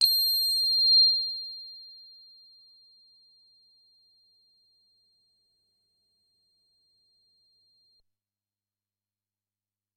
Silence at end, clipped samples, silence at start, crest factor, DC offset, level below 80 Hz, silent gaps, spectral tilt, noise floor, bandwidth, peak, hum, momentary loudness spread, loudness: 8.05 s; under 0.1%; 0 s; 24 dB; under 0.1%; -90 dBFS; none; 6 dB/octave; under -90 dBFS; 13 kHz; -8 dBFS; 50 Hz at -95 dBFS; 27 LU; -21 LUFS